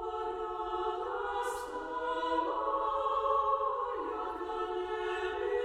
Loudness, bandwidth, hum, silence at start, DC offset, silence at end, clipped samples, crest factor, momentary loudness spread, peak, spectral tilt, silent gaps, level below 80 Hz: -34 LUFS; 15 kHz; none; 0 s; under 0.1%; 0 s; under 0.1%; 16 dB; 7 LU; -18 dBFS; -4 dB/octave; none; -58 dBFS